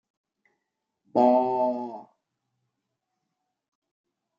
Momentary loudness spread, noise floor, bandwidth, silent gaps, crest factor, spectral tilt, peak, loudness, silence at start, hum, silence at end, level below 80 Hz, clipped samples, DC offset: 17 LU; -82 dBFS; 7 kHz; none; 22 dB; -8.5 dB/octave; -8 dBFS; -24 LUFS; 1.15 s; none; 2.35 s; -88 dBFS; under 0.1%; under 0.1%